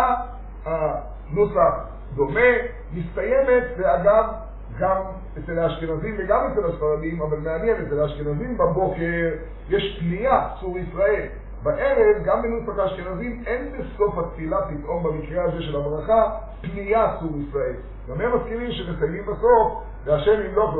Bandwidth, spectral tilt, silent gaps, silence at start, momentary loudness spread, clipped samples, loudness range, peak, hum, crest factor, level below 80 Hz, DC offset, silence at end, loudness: 4.2 kHz; -5 dB/octave; none; 0 s; 12 LU; under 0.1%; 4 LU; -4 dBFS; none; 18 dB; -36 dBFS; under 0.1%; 0 s; -23 LUFS